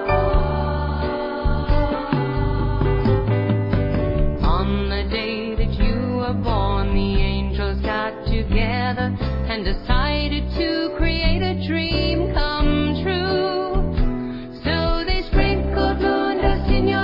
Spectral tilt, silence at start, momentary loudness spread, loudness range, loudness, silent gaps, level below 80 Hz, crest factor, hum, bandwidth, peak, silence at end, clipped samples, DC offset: -9 dB/octave; 0 s; 4 LU; 1 LU; -21 LUFS; none; -24 dBFS; 16 dB; none; 5.6 kHz; -4 dBFS; 0 s; under 0.1%; under 0.1%